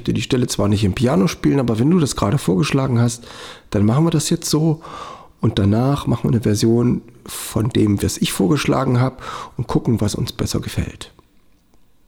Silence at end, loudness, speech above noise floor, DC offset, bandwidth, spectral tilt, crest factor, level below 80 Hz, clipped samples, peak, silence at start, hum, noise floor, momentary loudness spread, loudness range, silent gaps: 1 s; -18 LUFS; 35 dB; under 0.1%; 18.5 kHz; -6 dB/octave; 14 dB; -40 dBFS; under 0.1%; -4 dBFS; 0 s; none; -53 dBFS; 13 LU; 2 LU; none